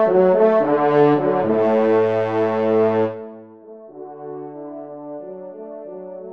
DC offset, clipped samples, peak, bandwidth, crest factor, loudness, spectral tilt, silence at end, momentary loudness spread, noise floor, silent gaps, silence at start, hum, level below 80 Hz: under 0.1%; under 0.1%; -4 dBFS; 5.8 kHz; 16 dB; -17 LUFS; -9 dB/octave; 0 s; 20 LU; -41 dBFS; none; 0 s; none; -68 dBFS